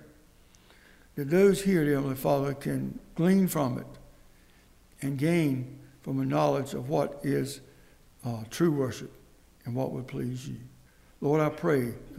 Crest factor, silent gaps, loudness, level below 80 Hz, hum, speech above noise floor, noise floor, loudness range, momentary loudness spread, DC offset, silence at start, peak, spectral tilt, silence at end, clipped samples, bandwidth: 18 dB; none; -29 LUFS; -56 dBFS; none; 30 dB; -58 dBFS; 6 LU; 17 LU; under 0.1%; 0 s; -10 dBFS; -7 dB/octave; 0 s; under 0.1%; 16 kHz